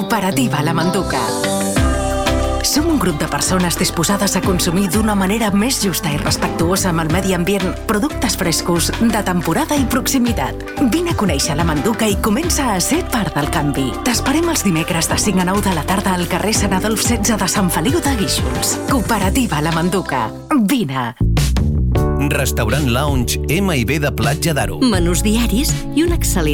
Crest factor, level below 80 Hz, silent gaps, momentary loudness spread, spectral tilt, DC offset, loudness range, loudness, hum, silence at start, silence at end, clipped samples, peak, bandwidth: 12 dB; -26 dBFS; none; 3 LU; -4.5 dB/octave; under 0.1%; 1 LU; -16 LUFS; none; 0 s; 0 s; under 0.1%; -4 dBFS; 18.5 kHz